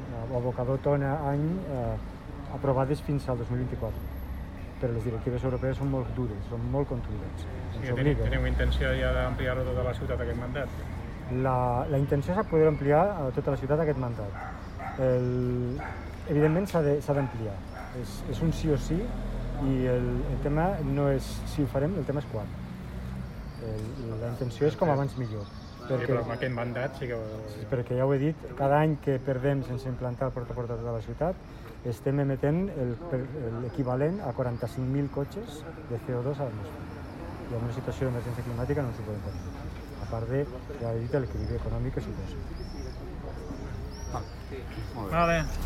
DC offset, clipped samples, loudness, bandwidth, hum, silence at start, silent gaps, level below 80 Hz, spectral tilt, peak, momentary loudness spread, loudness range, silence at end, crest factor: under 0.1%; under 0.1%; -30 LUFS; 14 kHz; none; 0 s; none; -40 dBFS; -8 dB/octave; -10 dBFS; 12 LU; 6 LU; 0 s; 18 dB